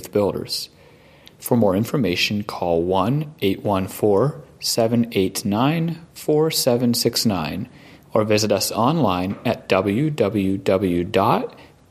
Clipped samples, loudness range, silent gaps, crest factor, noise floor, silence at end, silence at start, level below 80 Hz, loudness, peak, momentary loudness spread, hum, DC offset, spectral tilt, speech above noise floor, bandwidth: under 0.1%; 1 LU; none; 18 dB; -49 dBFS; 0.25 s; 0 s; -54 dBFS; -20 LUFS; -2 dBFS; 7 LU; none; under 0.1%; -5 dB/octave; 29 dB; 15.5 kHz